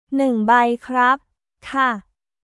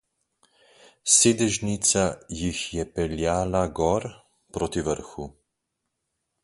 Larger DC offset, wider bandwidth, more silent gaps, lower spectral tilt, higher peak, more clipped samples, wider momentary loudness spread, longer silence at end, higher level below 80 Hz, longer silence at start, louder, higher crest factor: neither; about the same, 11.5 kHz vs 11.5 kHz; neither; first, -5.5 dB/octave vs -3.5 dB/octave; about the same, -2 dBFS vs -4 dBFS; neither; second, 9 LU vs 18 LU; second, 0.45 s vs 1.15 s; second, -60 dBFS vs -46 dBFS; second, 0.1 s vs 1.05 s; first, -18 LUFS vs -24 LUFS; second, 16 dB vs 22 dB